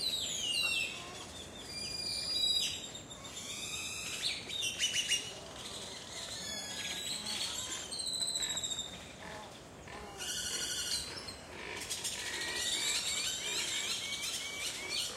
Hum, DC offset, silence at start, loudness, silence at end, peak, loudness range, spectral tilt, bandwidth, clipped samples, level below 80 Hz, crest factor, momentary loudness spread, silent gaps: none; under 0.1%; 0 s; -35 LUFS; 0 s; -20 dBFS; 4 LU; 0 dB/octave; 16 kHz; under 0.1%; -62 dBFS; 18 dB; 14 LU; none